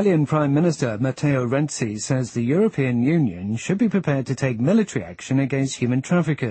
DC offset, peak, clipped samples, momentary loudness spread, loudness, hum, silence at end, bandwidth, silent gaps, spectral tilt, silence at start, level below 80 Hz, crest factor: under 0.1%; -6 dBFS; under 0.1%; 5 LU; -21 LUFS; none; 0 s; 8.8 kHz; none; -6.5 dB/octave; 0 s; -56 dBFS; 14 dB